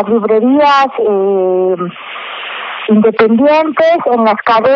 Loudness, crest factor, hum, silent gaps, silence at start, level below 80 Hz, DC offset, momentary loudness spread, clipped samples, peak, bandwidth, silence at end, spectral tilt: -11 LUFS; 10 dB; none; none; 0 s; -58 dBFS; under 0.1%; 13 LU; under 0.1%; 0 dBFS; 7 kHz; 0 s; -4 dB/octave